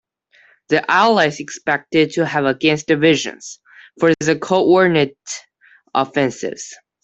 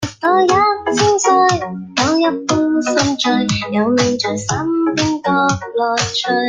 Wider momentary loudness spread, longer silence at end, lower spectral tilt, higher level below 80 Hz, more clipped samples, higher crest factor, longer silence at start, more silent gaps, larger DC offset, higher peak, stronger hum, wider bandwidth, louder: first, 17 LU vs 6 LU; first, 0.3 s vs 0 s; about the same, -4.5 dB/octave vs -4 dB/octave; second, -60 dBFS vs -48 dBFS; neither; about the same, 16 dB vs 14 dB; first, 0.7 s vs 0 s; neither; neither; about the same, -2 dBFS vs 0 dBFS; neither; second, 8.2 kHz vs 9.8 kHz; about the same, -17 LUFS vs -15 LUFS